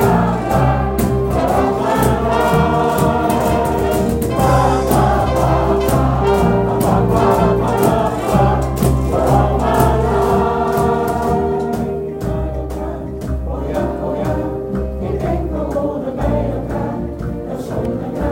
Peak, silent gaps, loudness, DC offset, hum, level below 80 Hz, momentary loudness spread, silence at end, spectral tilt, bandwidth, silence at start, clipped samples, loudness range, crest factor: 0 dBFS; none; -16 LUFS; under 0.1%; none; -26 dBFS; 8 LU; 0 s; -7 dB/octave; 17 kHz; 0 s; under 0.1%; 6 LU; 16 dB